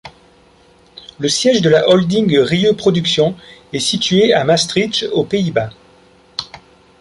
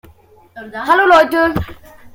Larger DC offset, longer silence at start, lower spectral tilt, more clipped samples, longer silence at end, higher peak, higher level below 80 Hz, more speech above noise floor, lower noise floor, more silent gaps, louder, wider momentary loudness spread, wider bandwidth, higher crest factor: neither; second, 0.05 s vs 0.55 s; about the same, -4.5 dB/octave vs -5.5 dB/octave; neither; first, 0.4 s vs 0.05 s; about the same, -2 dBFS vs 0 dBFS; second, -50 dBFS vs -40 dBFS; about the same, 35 dB vs 33 dB; about the same, -49 dBFS vs -46 dBFS; neither; about the same, -14 LUFS vs -12 LUFS; second, 15 LU vs 20 LU; second, 11.5 kHz vs 17 kHz; about the same, 14 dB vs 14 dB